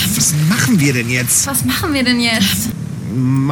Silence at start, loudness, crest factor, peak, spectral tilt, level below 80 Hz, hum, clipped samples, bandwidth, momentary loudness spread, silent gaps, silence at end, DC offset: 0 s; -14 LUFS; 14 dB; -2 dBFS; -3.5 dB/octave; -40 dBFS; none; under 0.1%; 17 kHz; 6 LU; none; 0 s; under 0.1%